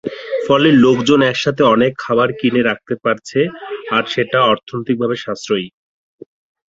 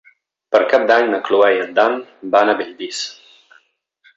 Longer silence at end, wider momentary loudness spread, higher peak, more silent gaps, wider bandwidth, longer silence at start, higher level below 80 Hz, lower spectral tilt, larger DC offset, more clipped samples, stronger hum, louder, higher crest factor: about the same, 1 s vs 1.05 s; about the same, 10 LU vs 12 LU; about the same, -2 dBFS vs -2 dBFS; neither; about the same, 7.8 kHz vs 8 kHz; second, 0.05 s vs 0.5 s; first, -54 dBFS vs -66 dBFS; first, -5.5 dB/octave vs -3 dB/octave; neither; neither; neither; about the same, -15 LUFS vs -16 LUFS; about the same, 14 dB vs 16 dB